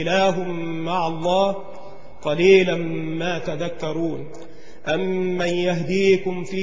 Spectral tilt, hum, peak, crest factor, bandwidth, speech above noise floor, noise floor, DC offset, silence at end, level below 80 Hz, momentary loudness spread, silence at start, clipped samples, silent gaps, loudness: -6 dB/octave; none; -4 dBFS; 18 dB; 7.6 kHz; 20 dB; -41 dBFS; 3%; 0 s; -54 dBFS; 17 LU; 0 s; under 0.1%; none; -21 LUFS